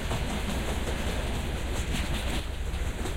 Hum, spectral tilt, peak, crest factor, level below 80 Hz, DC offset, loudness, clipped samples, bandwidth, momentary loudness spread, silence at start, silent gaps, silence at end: none; -4.5 dB/octave; -18 dBFS; 12 dB; -32 dBFS; under 0.1%; -32 LUFS; under 0.1%; 16 kHz; 3 LU; 0 s; none; 0 s